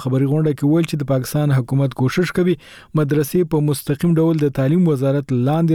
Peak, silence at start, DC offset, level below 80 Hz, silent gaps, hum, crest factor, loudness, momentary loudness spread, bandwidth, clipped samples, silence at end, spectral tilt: -8 dBFS; 0 s; under 0.1%; -48 dBFS; none; none; 10 dB; -18 LUFS; 4 LU; 17.5 kHz; under 0.1%; 0 s; -7.5 dB/octave